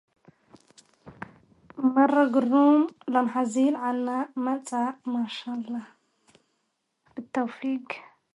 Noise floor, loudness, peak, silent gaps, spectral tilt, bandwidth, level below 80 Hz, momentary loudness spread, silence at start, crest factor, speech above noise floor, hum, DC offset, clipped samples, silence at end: -77 dBFS; -25 LUFS; -8 dBFS; none; -5 dB/octave; 11.5 kHz; -76 dBFS; 22 LU; 1.05 s; 18 dB; 52 dB; none; under 0.1%; under 0.1%; 0.35 s